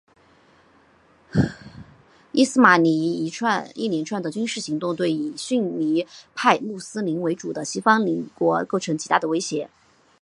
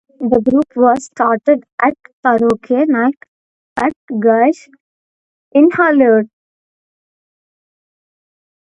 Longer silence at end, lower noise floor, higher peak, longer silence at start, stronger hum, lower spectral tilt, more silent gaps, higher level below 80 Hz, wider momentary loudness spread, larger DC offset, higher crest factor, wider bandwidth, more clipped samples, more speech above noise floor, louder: second, 0.55 s vs 2.4 s; second, -57 dBFS vs under -90 dBFS; about the same, 0 dBFS vs 0 dBFS; first, 1.35 s vs 0.2 s; neither; second, -5 dB/octave vs -6.5 dB/octave; second, none vs 1.72-1.78 s, 2.13-2.23 s, 3.28-3.76 s, 3.96-4.08 s, 4.80-5.51 s; about the same, -54 dBFS vs -54 dBFS; about the same, 10 LU vs 8 LU; neither; first, 22 dB vs 16 dB; first, 11.5 kHz vs 9.2 kHz; neither; second, 35 dB vs over 77 dB; second, -22 LUFS vs -14 LUFS